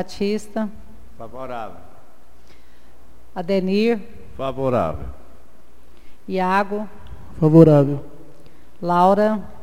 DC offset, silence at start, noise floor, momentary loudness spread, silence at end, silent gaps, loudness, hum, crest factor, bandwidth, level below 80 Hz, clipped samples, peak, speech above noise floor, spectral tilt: 3%; 0 s; -52 dBFS; 23 LU; 0.1 s; none; -19 LUFS; none; 20 dB; 13 kHz; -46 dBFS; under 0.1%; 0 dBFS; 33 dB; -8 dB/octave